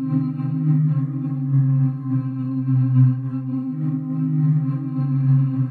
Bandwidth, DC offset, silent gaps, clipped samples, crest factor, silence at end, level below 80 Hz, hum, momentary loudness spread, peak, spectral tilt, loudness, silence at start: 2.8 kHz; under 0.1%; none; under 0.1%; 14 dB; 0 s; -68 dBFS; none; 7 LU; -6 dBFS; -13 dB/octave; -21 LUFS; 0 s